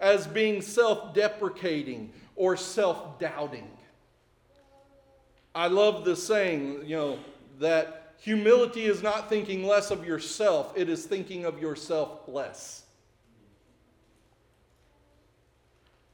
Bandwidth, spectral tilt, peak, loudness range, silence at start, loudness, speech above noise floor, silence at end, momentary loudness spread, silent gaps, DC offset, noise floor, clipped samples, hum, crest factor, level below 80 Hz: 18 kHz; -4 dB/octave; -10 dBFS; 10 LU; 0 s; -28 LUFS; 38 dB; 3.35 s; 14 LU; none; under 0.1%; -65 dBFS; under 0.1%; none; 20 dB; -68 dBFS